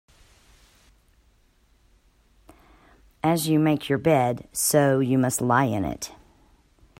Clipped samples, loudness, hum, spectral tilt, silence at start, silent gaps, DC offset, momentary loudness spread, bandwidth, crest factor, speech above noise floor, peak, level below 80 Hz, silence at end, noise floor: under 0.1%; -23 LUFS; none; -5 dB/octave; 3.25 s; none; under 0.1%; 8 LU; 16 kHz; 20 dB; 39 dB; -6 dBFS; -56 dBFS; 0.9 s; -61 dBFS